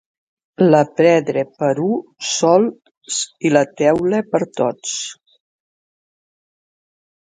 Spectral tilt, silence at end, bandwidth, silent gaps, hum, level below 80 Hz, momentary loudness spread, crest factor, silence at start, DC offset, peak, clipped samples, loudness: -4.5 dB/octave; 2.25 s; 9.6 kHz; 2.97-3.01 s; none; -62 dBFS; 10 LU; 18 dB; 0.6 s; under 0.1%; 0 dBFS; under 0.1%; -17 LUFS